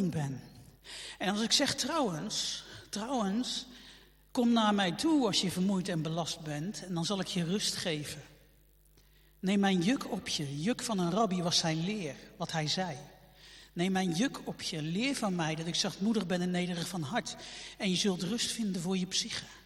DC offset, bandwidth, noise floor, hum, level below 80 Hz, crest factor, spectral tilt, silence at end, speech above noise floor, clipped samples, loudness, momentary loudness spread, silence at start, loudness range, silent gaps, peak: under 0.1%; 16 kHz; -63 dBFS; none; -64 dBFS; 22 dB; -4 dB/octave; 0.05 s; 31 dB; under 0.1%; -32 LUFS; 12 LU; 0 s; 3 LU; none; -12 dBFS